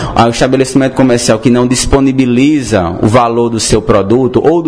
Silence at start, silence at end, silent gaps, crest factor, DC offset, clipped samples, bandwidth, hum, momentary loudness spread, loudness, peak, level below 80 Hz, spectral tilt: 0 s; 0 s; none; 8 dB; 0.6%; 1%; 11 kHz; none; 2 LU; -9 LUFS; 0 dBFS; -28 dBFS; -5.5 dB/octave